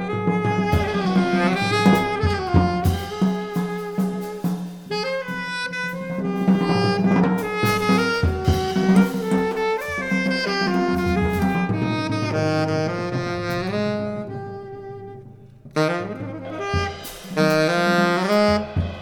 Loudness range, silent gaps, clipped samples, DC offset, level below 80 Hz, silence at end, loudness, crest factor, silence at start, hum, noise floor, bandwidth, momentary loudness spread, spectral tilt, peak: 7 LU; none; under 0.1%; under 0.1%; -40 dBFS; 0 s; -21 LUFS; 18 dB; 0 s; none; -43 dBFS; 19 kHz; 10 LU; -6.5 dB/octave; -2 dBFS